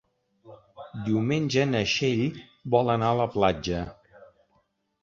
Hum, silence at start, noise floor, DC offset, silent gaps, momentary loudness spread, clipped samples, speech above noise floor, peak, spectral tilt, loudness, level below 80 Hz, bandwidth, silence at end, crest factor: none; 0.45 s; -70 dBFS; under 0.1%; none; 15 LU; under 0.1%; 45 dB; -8 dBFS; -6 dB/octave; -25 LUFS; -52 dBFS; 7.6 kHz; 1.1 s; 20 dB